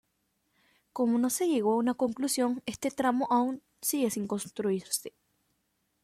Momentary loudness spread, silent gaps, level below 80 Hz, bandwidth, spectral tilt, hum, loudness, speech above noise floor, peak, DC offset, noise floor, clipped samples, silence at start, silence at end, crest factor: 7 LU; none; -70 dBFS; 15.5 kHz; -4 dB/octave; none; -30 LUFS; 48 dB; -14 dBFS; under 0.1%; -77 dBFS; under 0.1%; 0.95 s; 0.95 s; 16 dB